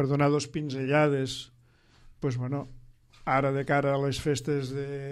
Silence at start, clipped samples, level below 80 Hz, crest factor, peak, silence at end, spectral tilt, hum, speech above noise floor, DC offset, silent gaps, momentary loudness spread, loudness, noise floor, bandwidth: 0 s; under 0.1%; -54 dBFS; 18 dB; -12 dBFS; 0 s; -6 dB/octave; none; 32 dB; under 0.1%; none; 11 LU; -28 LUFS; -60 dBFS; 12.5 kHz